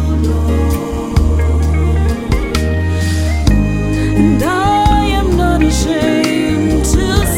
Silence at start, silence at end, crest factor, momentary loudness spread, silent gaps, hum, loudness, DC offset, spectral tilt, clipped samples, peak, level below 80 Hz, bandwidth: 0 s; 0 s; 12 dB; 4 LU; none; none; -14 LUFS; under 0.1%; -6 dB/octave; under 0.1%; 0 dBFS; -16 dBFS; 16 kHz